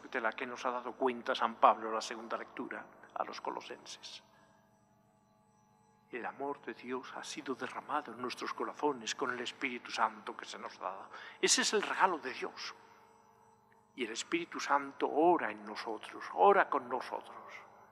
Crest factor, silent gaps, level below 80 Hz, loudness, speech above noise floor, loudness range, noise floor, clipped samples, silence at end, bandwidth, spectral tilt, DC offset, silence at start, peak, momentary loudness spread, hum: 26 dB; none; -88 dBFS; -35 LUFS; 33 dB; 14 LU; -69 dBFS; under 0.1%; 0.05 s; 14 kHz; -2 dB/octave; under 0.1%; 0 s; -10 dBFS; 17 LU; 50 Hz at -70 dBFS